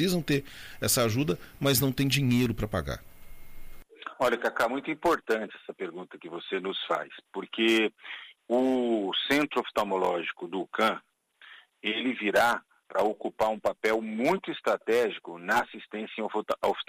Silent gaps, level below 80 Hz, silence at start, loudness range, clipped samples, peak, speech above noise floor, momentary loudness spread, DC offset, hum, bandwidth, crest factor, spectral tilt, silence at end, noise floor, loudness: none; -52 dBFS; 0 s; 3 LU; under 0.1%; -12 dBFS; 26 dB; 14 LU; under 0.1%; none; 15.5 kHz; 18 dB; -4.5 dB/octave; 0.05 s; -54 dBFS; -28 LUFS